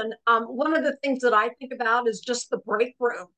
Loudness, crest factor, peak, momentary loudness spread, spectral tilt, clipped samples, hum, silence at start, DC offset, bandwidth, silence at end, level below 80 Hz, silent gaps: -24 LUFS; 16 dB; -8 dBFS; 7 LU; -3 dB/octave; under 0.1%; none; 0 s; under 0.1%; 9.2 kHz; 0.1 s; -80 dBFS; none